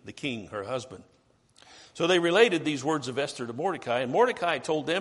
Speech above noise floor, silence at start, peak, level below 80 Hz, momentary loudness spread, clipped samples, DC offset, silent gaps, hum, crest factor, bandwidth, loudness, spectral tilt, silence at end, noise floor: 32 dB; 0.05 s; -6 dBFS; -70 dBFS; 13 LU; under 0.1%; under 0.1%; none; none; 20 dB; 11.5 kHz; -27 LUFS; -4.5 dB/octave; 0 s; -59 dBFS